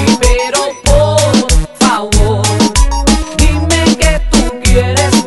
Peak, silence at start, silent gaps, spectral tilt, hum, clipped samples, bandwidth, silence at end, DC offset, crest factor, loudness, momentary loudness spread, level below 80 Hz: 0 dBFS; 0 s; none; -4.5 dB/octave; none; 0.3%; 12 kHz; 0 s; 0.9%; 10 dB; -11 LUFS; 3 LU; -14 dBFS